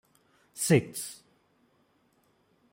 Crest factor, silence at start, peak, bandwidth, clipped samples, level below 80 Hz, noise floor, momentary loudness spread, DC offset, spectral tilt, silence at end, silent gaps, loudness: 24 dB; 0.55 s; -10 dBFS; 16.5 kHz; under 0.1%; -70 dBFS; -69 dBFS; 24 LU; under 0.1%; -5 dB/octave; 1.6 s; none; -28 LUFS